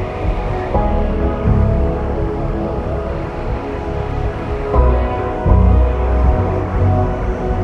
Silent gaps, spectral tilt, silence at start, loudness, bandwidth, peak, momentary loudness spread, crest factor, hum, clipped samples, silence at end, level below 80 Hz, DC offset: none; -9.5 dB/octave; 0 s; -18 LUFS; 5.6 kHz; 0 dBFS; 8 LU; 14 dB; none; under 0.1%; 0 s; -18 dBFS; under 0.1%